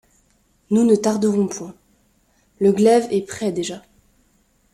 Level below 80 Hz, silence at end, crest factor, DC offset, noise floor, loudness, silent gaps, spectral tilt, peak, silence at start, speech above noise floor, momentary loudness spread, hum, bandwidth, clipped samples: -60 dBFS; 0.95 s; 18 dB; under 0.1%; -61 dBFS; -19 LUFS; none; -6 dB/octave; -4 dBFS; 0.7 s; 43 dB; 15 LU; none; 13.5 kHz; under 0.1%